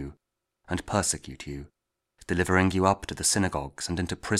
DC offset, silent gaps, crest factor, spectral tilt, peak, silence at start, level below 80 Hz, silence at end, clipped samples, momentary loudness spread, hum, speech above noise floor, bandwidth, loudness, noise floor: under 0.1%; none; 22 dB; -4 dB/octave; -6 dBFS; 0 s; -48 dBFS; 0 s; under 0.1%; 16 LU; none; 50 dB; 15.5 kHz; -27 LUFS; -77 dBFS